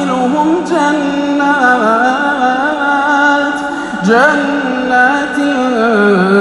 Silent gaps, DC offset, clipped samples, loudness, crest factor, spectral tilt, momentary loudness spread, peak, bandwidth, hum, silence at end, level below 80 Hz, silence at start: none; under 0.1%; under 0.1%; -11 LUFS; 12 dB; -5 dB/octave; 5 LU; 0 dBFS; 11.5 kHz; none; 0 s; -48 dBFS; 0 s